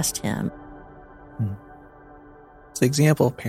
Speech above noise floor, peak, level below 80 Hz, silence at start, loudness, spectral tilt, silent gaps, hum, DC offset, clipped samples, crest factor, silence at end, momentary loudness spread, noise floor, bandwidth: 26 dB; -4 dBFS; -52 dBFS; 0 s; -23 LUFS; -5.5 dB/octave; none; none; under 0.1%; under 0.1%; 22 dB; 0 s; 25 LU; -48 dBFS; 15.5 kHz